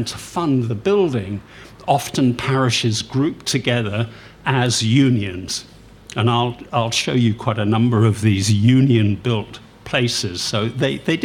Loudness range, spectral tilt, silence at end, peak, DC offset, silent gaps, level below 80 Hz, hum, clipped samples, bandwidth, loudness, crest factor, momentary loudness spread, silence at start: 3 LU; -5.5 dB/octave; 0 s; -2 dBFS; under 0.1%; none; -50 dBFS; none; under 0.1%; 15 kHz; -19 LUFS; 18 dB; 10 LU; 0 s